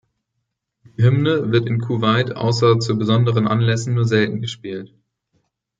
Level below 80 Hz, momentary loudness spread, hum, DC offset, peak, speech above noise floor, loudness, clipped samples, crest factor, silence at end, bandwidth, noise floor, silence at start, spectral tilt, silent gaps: -58 dBFS; 11 LU; none; under 0.1%; -2 dBFS; 59 dB; -18 LUFS; under 0.1%; 16 dB; 0.95 s; 7.8 kHz; -76 dBFS; 1 s; -6.5 dB/octave; none